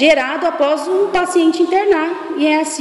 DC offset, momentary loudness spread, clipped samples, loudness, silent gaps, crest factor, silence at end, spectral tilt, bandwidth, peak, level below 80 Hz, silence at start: under 0.1%; 4 LU; under 0.1%; -15 LUFS; none; 14 dB; 0 s; -2.5 dB/octave; 12 kHz; 0 dBFS; -50 dBFS; 0 s